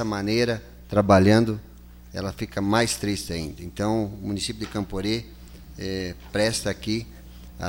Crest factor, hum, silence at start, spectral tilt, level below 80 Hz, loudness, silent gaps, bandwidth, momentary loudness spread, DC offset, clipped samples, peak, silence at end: 22 dB; 60 Hz at -45 dBFS; 0 s; -5 dB/octave; -44 dBFS; -25 LUFS; none; 17 kHz; 16 LU; under 0.1%; under 0.1%; -4 dBFS; 0 s